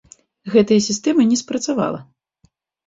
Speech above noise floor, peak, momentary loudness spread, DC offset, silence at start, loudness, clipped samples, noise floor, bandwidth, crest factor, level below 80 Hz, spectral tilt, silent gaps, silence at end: 44 dB; -2 dBFS; 11 LU; under 0.1%; 0.45 s; -18 LUFS; under 0.1%; -61 dBFS; 7.8 kHz; 18 dB; -58 dBFS; -4.5 dB/octave; none; 0.85 s